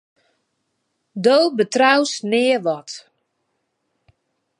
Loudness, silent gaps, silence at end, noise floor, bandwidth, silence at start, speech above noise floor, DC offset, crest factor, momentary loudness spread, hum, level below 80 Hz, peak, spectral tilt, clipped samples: -17 LUFS; none; 1.6 s; -73 dBFS; 11 kHz; 1.15 s; 55 dB; under 0.1%; 20 dB; 20 LU; none; -76 dBFS; -2 dBFS; -3.5 dB/octave; under 0.1%